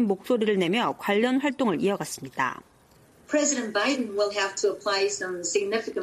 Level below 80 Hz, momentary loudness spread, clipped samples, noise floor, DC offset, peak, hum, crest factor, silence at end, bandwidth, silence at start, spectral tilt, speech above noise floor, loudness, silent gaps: -68 dBFS; 6 LU; under 0.1%; -57 dBFS; under 0.1%; -10 dBFS; none; 16 dB; 0 s; 15 kHz; 0 s; -3.5 dB/octave; 31 dB; -26 LUFS; none